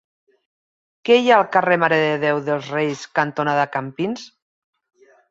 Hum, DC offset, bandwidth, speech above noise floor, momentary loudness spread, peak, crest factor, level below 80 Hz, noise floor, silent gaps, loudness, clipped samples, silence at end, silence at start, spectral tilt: none; under 0.1%; 7.8 kHz; over 72 dB; 11 LU; -2 dBFS; 20 dB; -68 dBFS; under -90 dBFS; none; -19 LUFS; under 0.1%; 1.05 s; 1.05 s; -5.5 dB/octave